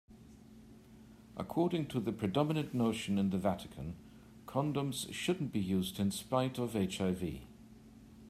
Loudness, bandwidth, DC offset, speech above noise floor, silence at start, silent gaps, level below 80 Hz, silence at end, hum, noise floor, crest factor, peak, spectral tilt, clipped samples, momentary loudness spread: -36 LUFS; 15 kHz; under 0.1%; 22 dB; 0.1 s; none; -62 dBFS; 0 s; none; -57 dBFS; 20 dB; -16 dBFS; -6 dB/octave; under 0.1%; 13 LU